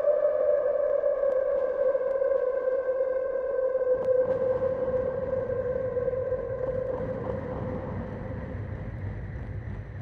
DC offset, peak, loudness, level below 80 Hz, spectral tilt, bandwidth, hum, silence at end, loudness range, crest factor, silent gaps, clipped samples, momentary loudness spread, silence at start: under 0.1%; -14 dBFS; -28 LUFS; -46 dBFS; -10 dB/octave; 3.9 kHz; none; 0 s; 7 LU; 14 dB; none; under 0.1%; 11 LU; 0 s